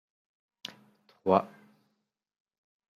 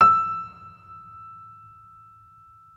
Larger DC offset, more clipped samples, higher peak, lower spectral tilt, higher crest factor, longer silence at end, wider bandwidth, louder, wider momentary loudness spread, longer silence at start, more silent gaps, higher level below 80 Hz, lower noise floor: neither; neither; about the same, -6 dBFS vs -4 dBFS; about the same, -7 dB/octave vs -6 dB/octave; first, 30 dB vs 20 dB; about the same, 1.55 s vs 1.45 s; first, 14.5 kHz vs 7.2 kHz; second, -28 LUFS vs -21 LUFS; second, 18 LU vs 26 LU; first, 1.25 s vs 0 s; neither; second, -82 dBFS vs -62 dBFS; first, -81 dBFS vs -52 dBFS